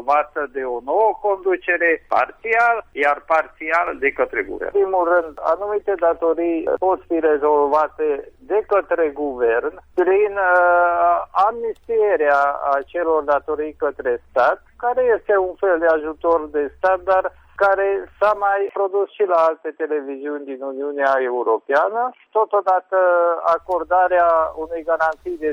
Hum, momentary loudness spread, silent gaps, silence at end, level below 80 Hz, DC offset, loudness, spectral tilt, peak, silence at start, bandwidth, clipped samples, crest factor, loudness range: none; 8 LU; none; 0 s; -52 dBFS; under 0.1%; -19 LUFS; -6 dB/octave; -2 dBFS; 0 s; 7.2 kHz; under 0.1%; 16 dB; 3 LU